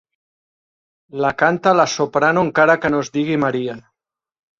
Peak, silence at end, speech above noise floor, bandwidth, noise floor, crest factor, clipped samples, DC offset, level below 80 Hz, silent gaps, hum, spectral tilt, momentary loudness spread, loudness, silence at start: -2 dBFS; 0.8 s; 66 dB; 7.6 kHz; -83 dBFS; 18 dB; under 0.1%; under 0.1%; -56 dBFS; none; none; -5 dB/octave; 11 LU; -17 LUFS; 1.15 s